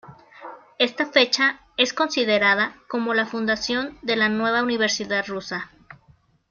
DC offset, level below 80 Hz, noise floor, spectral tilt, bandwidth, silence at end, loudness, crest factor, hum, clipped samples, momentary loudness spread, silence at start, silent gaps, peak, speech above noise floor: under 0.1%; -60 dBFS; -58 dBFS; -2.5 dB/octave; 7.2 kHz; 0.55 s; -21 LUFS; 22 dB; none; under 0.1%; 14 LU; 0.05 s; none; -2 dBFS; 36 dB